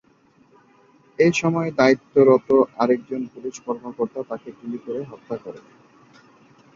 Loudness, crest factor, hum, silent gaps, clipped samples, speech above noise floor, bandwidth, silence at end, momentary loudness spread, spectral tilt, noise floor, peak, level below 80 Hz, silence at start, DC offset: -21 LUFS; 20 dB; none; none; under 0.1%; 37 dB; 7.6 kHz; 1.15 s; 17 LU; -6 dB/octave; -57 dBFS; -2 dBFS; -64 dBFS; 1.2 s; under 0.1%